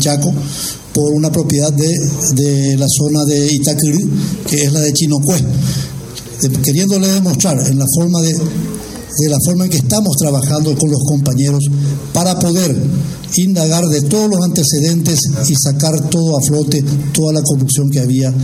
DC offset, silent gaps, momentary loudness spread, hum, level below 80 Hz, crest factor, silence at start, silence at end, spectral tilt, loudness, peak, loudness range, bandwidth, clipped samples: under 0.1%; none; 5 LU; none; -40 dBFS; 12 dB; 0 s; 0 s; -5 dB/octave; -13 LUFS; 0 dBFS; 1 LU; 16.5 kHz; under 0.1%